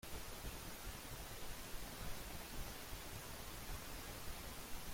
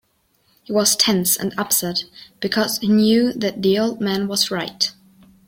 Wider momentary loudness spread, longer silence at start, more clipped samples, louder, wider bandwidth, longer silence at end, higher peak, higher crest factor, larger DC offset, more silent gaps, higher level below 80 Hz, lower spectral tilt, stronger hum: second, 1 LU vs 8 LU; second, 0.05 s vs 0.7 s; neither; second, -50 LUFS vs -19 LUFS; about the same, 16.5 kHz vs 16.5 kHz; second, 0 s vs 0.55 s; second, -34 dBFS vs -2 dBFS; about the same, 14 dB vs 18 dB; neither; neither; about the same, -54 dBFS vs -58 dBFS; about the same, -3 dB/octave vs -3.5 dB/octave; neither